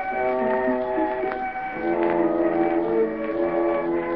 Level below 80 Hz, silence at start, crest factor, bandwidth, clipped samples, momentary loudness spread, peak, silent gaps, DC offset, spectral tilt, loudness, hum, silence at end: -52 dBFS; 0 s; 16 dB; 5 kHz; under 0.1%; 5 LU; -8 dBFS; none; 0.2%; -5.5 dB/octave; -23 LUFS; none; 0 s